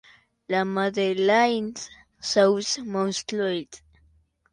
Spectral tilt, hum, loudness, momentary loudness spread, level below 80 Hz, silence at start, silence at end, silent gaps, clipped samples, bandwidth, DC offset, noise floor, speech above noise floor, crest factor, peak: -4 dB/octave; none; -24 LUFS; 14 LU; -64 dBFS; 0.5 s; 0.75 s; none; under 0.1%; 10.5 kHz; under 0.1%; -62 dBFS; 39 dB; 18 dB; -8 dBFS